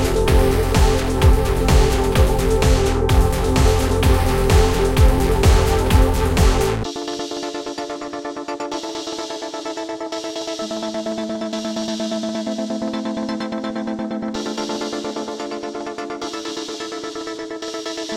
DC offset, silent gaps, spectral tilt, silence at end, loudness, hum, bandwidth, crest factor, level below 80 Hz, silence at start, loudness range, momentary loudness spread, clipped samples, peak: under 0.1%; none; -5.5 dB/octave; 0 s; -20 LUFS; none; 16.5 kHz; 16 dB; -22 dBFS; 0 s; 10 LU; 11 LU; under 0.1%; -2 dBFS